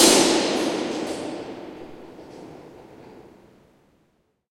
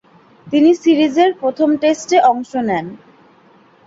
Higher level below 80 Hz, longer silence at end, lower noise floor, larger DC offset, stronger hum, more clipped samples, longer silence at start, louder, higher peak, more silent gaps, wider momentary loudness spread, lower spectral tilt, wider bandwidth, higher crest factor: about the same, -62 dBFS vs -60 dBFS; first, 1.3 s vs 0.9 s; first, -67 dBFS vs -49 dBFS; neither; neither; neither; second, 0 s vs 0.45 s; second, -22 LUFS vs -15 LUFS; about the same, -2 dBFS vs -2 dBFS; neither; first, 27 LU vs 8 LU; second, -2 dB/octave vs -5 dB/octave; first, 16.5 kHz vs 8 kHz; first, 22 dB vs 14 dB